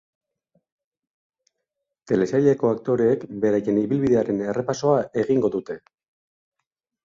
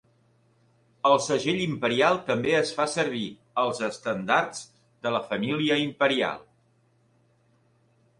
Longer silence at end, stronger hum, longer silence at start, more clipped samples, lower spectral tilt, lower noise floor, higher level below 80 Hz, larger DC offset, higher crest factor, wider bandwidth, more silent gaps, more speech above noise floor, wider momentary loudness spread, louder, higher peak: second, 1.25 s vs 1.8 s; neither; first, 2.05 s vs 1.05 s; neither; first, -7.5 dB/octave vs -4.5 dB/octave; first, -82 dBFS vs -65 dBFS; first, -60 dBFS vs -66 dBFS; neither; about the same, 18 dB vs 20 dB; second, 7.6 kHz vs 11.5 kHz; neither; first, 61 dB vs 40 dB; second, 6 LU vs 9 LU; first, -22 LUFS vs -26 LUFS; about the same, -6 dBFS vs -6 dBFS